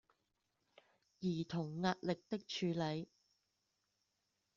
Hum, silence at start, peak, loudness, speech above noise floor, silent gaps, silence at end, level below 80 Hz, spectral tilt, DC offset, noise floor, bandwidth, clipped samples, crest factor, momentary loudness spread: none; 1.2 s; -24 dBFS; -41 LUFS; 45 dB; none; 1.5 s; -78 dBFS; -5 dB/octave; under 0.1%; -85 dBFS; 7.4 kHz; under 0.1%; 20 dB; 6 LU